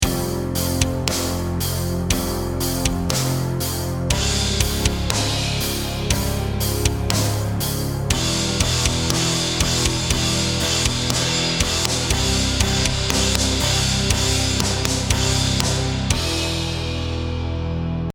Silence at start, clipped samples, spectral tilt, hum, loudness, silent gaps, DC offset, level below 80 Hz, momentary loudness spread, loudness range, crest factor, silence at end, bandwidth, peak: 0 s; under 0.1%; -3.5 dB/octave; none; -20 LUFS; none; under 0.1%; -28 dBFS; 5 LU; 3 LU; 20 dB; 0.05 s; 19.5 kHz; 0 dBFS